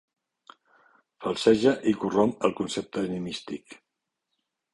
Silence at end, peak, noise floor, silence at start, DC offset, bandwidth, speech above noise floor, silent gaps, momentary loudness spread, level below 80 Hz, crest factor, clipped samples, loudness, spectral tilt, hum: 1 s; -6 dBFS; -82 dBFS; 1.2 s; under 0.1%; 11.5 kHz; 57 dB; none; 14 LU; -62 dBFS; 22 dB; under 0.1%; -26 LUFS; -5.5 dB/octave; none